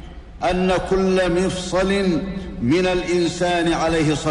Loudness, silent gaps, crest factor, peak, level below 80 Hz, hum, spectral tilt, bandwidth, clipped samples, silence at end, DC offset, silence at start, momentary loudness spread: -20 LUFS; none; 12 dB; -8 dBFS; -36 dBFS; none; -5.5 dB/octave; 11 kHz; under 0.1%; 0 s; under 0.1%; 0 s; 6 LU